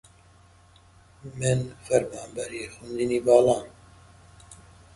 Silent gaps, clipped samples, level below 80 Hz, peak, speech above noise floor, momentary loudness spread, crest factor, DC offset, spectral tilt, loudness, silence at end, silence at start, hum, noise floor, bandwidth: none; under 0.1%; -56 dBFS; -4 dBFS; 31 dB; 20 LU; 24 dB; under 0.1%; -5.5 dB/octave; -25 LUFS; 0.4 s; 1.25 s; none; -55 dBFS; 11.5 kHz